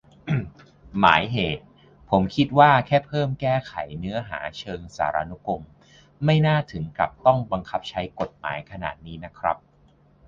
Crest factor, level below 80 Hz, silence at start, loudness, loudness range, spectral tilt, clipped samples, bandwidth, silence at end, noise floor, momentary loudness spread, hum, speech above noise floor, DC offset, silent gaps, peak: 24 dB; -48 dBFS; 0.25 s; -23 LUFS; 6 LU; -7 dB/octave; under 0.1%; 7.4 kHz; 0.7 s; -57 dBFS; 15 LU; none; 34 dB; under 0.1%; none; 0 dBFS